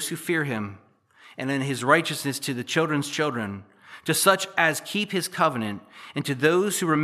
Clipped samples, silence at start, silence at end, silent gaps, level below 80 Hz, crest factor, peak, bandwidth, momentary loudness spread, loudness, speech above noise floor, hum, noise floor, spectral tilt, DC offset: under 0.1%; 0 s; 0 s; none; -76 dBFS; 22 dB; -4 dBFS; 15 kHz; 13 LU; -24 LUFS; 29 dB; none; -54 dBFS; -4 dB/octave; under 0.1%